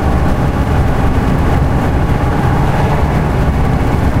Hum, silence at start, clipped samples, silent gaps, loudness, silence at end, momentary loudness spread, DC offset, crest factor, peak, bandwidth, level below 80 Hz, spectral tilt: none; 0 s; under 0.1%; none; -14 LUFS; 0 s; 1 LU; under 0.1%; 10 dB; 0 dBFS; 15.5 kHz; -16 dBFS; -7.5 dB/octave